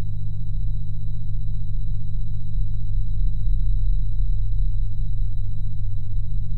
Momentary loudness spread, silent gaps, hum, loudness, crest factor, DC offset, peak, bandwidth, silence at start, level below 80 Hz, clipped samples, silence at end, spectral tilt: 4 LU; none; 50 Hz at -30 dBFS; -29 LUFS; 8 dB; under 0.1%; -8 dBFS; 3.9 kHz; 0 s; -24 dBFS; under 0.1%; 0 s; -10 dB/octave